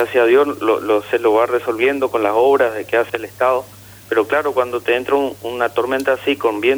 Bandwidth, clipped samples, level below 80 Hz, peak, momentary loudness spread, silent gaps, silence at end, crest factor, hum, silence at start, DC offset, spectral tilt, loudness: over 20 kHz; under 0.1%; -58 dBFS; -2 dBFS; 6 LU; none; 0 s; 14 dB; 50 Hz at -45 dBFS; 0 s; under 0.1%; -4.5 dB/octave; -17 LUFS